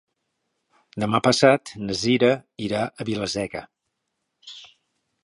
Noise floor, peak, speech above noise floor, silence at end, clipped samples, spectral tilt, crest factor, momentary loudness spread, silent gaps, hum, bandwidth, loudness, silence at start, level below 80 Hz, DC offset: -78 dBFS; -2 dBFS; 56 dB; 0.6 s; under 0.1%; -4.5 dB/octave; 22 dB; 23 LU; none; none; 11.5 kHz; -22 LUFS; 0.95 s; -58 dBFS; under 0.1%